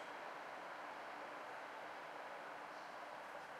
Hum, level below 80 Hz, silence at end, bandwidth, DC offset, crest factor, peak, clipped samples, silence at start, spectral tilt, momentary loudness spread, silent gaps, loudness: none; under -90 dBFS; 0 s; 16 kHz; under 0.1%; 12 dB; -38 dBFS; under 0.1%; 0 s; -3 dB/octave; 1 LU; none; -51 LUFS